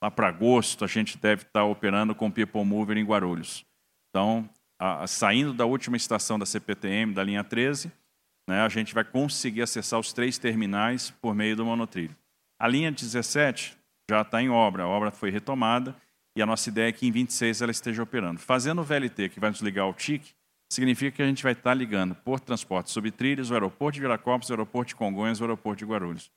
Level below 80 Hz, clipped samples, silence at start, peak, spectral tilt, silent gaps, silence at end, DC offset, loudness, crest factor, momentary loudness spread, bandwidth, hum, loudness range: -70 dBFS; under 0.1%; 0 s; -6 dBFS; -4.5 dB/octave; none; 0.1 s; under 0.1%; -27 LUFS; 20 dB; 7 LU; 15.5 kHz; none; 2 LU